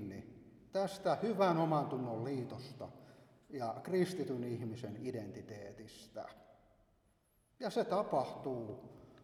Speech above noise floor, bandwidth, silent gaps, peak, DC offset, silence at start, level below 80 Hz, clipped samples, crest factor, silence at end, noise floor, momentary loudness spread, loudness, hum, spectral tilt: 36 dB; 15 kHz; none; -20 dBFS; under 0.1%; 0 s; -74 dBFS; under 0.1%; 20 dB; 0 s; -75 dBFS; 18 LU; -38 LUFS; none; -7 dB/octave